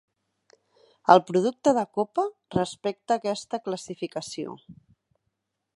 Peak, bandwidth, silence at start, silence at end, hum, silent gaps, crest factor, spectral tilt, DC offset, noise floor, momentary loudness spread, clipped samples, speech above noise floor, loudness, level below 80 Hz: -2 dBFS; 11.5 kHz; 1.1 s; 1.05 s; none; none; 26 dB; -5.5 dB/octave; under 0.1%; -80 dBFS; 15 LU; under 0.1%; 54 dB; -26 LUFS; -66 dBFS